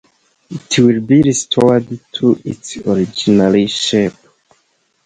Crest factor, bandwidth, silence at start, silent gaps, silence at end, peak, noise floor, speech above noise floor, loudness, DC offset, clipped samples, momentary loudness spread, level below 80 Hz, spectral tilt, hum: 14 dB; 9.6 kHz; 0.5 s; none; 0.95 s; 0 dBFS; -61 dBFS; 48 dB; -14 LUFS; under 0.1%; under 0.1%; 12 LU; -48 dBFS; -5 dB/octave; none